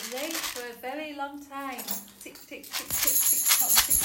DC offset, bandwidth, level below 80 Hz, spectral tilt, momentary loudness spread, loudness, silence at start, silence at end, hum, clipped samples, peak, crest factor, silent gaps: under 0.1%; 18.5 kHz; -54 dBFS; 0.5 dB/octave; 20 LU; -24 LUFS; 0 s; 0 s; none; under 0.1%; -2 dBFS; 26 dB; none